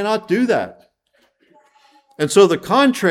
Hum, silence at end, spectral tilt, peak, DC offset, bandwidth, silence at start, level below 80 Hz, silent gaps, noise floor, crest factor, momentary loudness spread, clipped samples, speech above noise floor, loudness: none; 0 s; -4.5 dB/octave; -2 dBFS; under 0.1%; 15.5 kHz; 0 s; -62 dBFS; none; -62 dBFS; 16 dB; 9 LU; under 0.1%; 46 dB; -16 LUFS